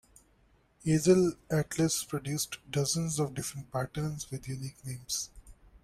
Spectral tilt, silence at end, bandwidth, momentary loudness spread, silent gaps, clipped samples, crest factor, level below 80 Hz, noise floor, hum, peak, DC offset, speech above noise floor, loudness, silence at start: -5 dB/octave; 0.05 s; 16 kHz; 14 LU; none; under 0.1%; 20 dB; -58 dBFS; -66 dBFS; none; -12 dBFS; under 0.1%; 35 dB; -31 LUFS; 0.85 s